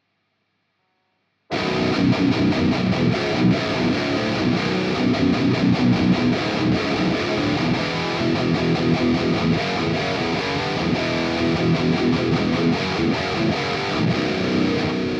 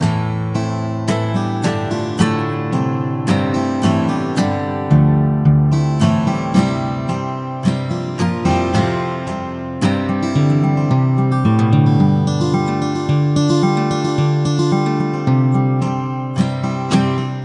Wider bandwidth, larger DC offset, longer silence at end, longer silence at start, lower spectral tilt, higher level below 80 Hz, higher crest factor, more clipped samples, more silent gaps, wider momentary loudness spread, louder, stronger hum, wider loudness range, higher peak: about the same, 9.6 kHz vs 10.5 kHz; neither; about the same, 0 s vs 0 s; first, 1.5 s vs 0 s; about the same, -6.5 dB/octave vs -7.5 dB/octave; about the same, -46 dBFS vs -44 dBFS; about the same, 14 dB vs 16 dB; neither; neither; second, 3 LU vs 7 LU; second, -20 LUFS vs -17 LUFS; neither; second, 1 LU vs 4 LU; second, -8 dBFS vs 0 dBFS